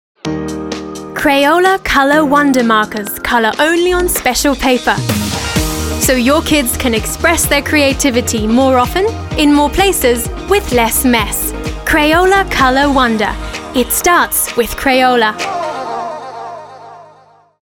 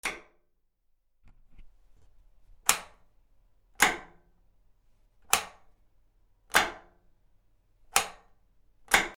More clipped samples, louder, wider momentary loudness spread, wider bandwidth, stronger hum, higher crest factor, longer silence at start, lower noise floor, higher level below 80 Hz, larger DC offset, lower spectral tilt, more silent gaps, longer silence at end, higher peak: neither; first, -12 LUFS vs -28 LUFS; second, 11 LU vs 15 LU; second, 17.5 kHz vs 19.5 kHz; neither; second, 12 dB vs 34 dB; first, 0.25 s vs 0.05 s; second, -45 dBFS vs -71 dBFS; first, -28 dBFS vs -58 dBFS; neither; first, -3.5 dB/octave vs 0 dB/octave; neither; first, 0.6 s vs 0.05 s; about the same, 0 dBFS vs 0 dBFS